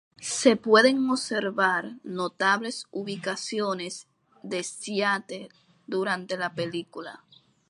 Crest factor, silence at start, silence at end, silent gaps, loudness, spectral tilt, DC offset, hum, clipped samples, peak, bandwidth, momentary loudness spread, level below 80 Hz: 22 dB; 0.2 s; 0.5 s; none; -26 LUFS; -3.5 dB/octave; under 0.1%; none; under 0.1%; -6 dBFS; 11.5 kHz; 18 LU; -76 dBFS